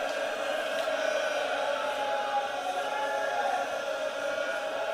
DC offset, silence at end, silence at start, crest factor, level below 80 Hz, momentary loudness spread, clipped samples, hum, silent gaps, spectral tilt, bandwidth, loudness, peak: under 0.1%; 0 s; 0 s; 12 dB; -76 dBFS; 3 LU; under 0.1%; none; none; -1 dB/octave; 15.5 kHz; -30 LUFS; -18 dBFS